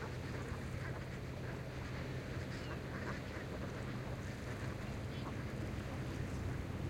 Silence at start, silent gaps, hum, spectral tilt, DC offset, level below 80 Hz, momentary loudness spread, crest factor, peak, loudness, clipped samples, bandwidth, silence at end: 0 s; none; none; -6.5 dB/octave; under 0.1%; -54 dBFS; 2 LU; 14 dB; -30 dBFS; -44 LUFS; under 0.1%; 16.5 kHz; 0 s